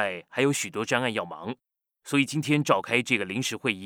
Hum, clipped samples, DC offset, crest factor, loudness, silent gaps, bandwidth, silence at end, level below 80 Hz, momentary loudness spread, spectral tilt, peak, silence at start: none; under 0.1%; under 0.1%; 20 dB; -26 LUFS; none; 18.5 kHz; 0 s; -74 dBFS; 12 LU; -4 dB/octave; -6 dBFS; 0 s